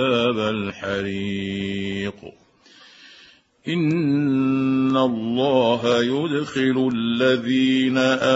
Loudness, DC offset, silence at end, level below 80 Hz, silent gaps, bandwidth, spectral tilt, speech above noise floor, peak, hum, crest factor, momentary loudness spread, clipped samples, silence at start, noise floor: -21 LUFS; under 0.1%; 0 s; -60 dBFS; none; 8 kHz; -6 dB/octave; 31 dB; -4 dBFS; none; 16 dB; 8 LU; under 0.1%; 0 s; -51 dBFS